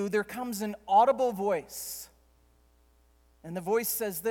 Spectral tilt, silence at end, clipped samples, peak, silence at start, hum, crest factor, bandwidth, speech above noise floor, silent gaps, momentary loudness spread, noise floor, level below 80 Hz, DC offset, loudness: -4 dB/octave; 0 s; under 0.1%; -12 dBFS; 0 s; none; 18 dB; 19.5 kHz; 35 dB; none; 17 LU; -64 dBFS; -64 dBFS; under 0.1%; -29 LUFS